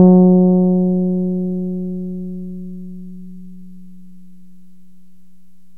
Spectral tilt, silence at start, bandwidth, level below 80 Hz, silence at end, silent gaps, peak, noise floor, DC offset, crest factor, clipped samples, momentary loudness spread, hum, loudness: -14.5 dB/octave; 0 s; 1.3 kHz; -54 dBFS; 2.05 s; none; 0 dBFS; -53 dBFS; 2%; 18 dB; under 0.1%; 25 LU; none; -16 LUFS